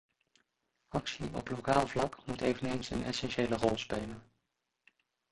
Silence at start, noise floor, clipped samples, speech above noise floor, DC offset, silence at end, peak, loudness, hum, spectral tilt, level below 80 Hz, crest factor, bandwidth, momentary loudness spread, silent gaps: 0.9 s; -84 dBFS; under 0.1%; 50 dB; under 0.1%; 1.1 s; -12 dBFS; -35 LUFS; none; -5 dB/octave; -56 dBFS; 24 dB; 11.5 kHz; 9 LU; none